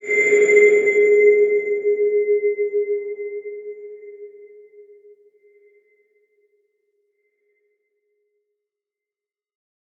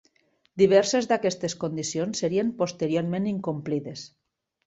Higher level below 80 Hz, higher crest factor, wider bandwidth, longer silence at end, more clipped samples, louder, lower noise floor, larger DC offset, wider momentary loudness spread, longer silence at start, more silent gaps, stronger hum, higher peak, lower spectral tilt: second, -80 dBFS vs -64 dBFS; about the same, 18 dB vs 18 dB; about the same, 7.6 kHz vs 8.2 kHz; first, 5.55 s vs 0.6 s; neither; first, -17 LUFS vs -25 LUFS; first, under -90 dBFS vs -67 dBFS; neither; first, 23 LU vs 13 LU; second, 0.05 s vs 0.55 s; neither; neither; first, -2 dBFS vs -8 dBFS; about the same, -4 dB/octave vs -5 dB/octave